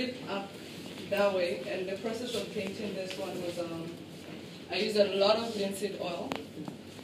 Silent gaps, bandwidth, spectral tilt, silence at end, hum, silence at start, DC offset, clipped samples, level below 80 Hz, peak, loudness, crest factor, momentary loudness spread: none; 15.5 kHz; -4.5 dB/octave; 0 s; none; 0 s; under 0.1%; under 0.1%; -72 dBFS; -12 dBFS; -33 LUFS; 22 dB; 16 LU